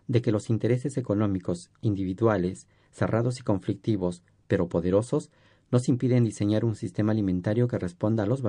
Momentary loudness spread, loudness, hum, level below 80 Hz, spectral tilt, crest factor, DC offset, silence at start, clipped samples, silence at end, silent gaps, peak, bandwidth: 6 LU; -27 LUFS; none; -58 dBFS; -8 dB/octave; 18 dB; under 0.1%; 0.1 s; under 0.1%; 0 s; none; -8 dBFS; 10.5 kHz